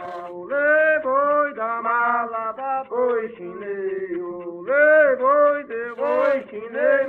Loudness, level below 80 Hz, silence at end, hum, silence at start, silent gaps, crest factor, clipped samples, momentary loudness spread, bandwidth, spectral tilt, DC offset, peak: -20 LUFS; -68 dBFS; 0 s; none; 0 s; none; 16 dB; under 0.1%; 15 LU; 4.3 kHz; -7 dB/octave; under 0.1%; -4 dBFS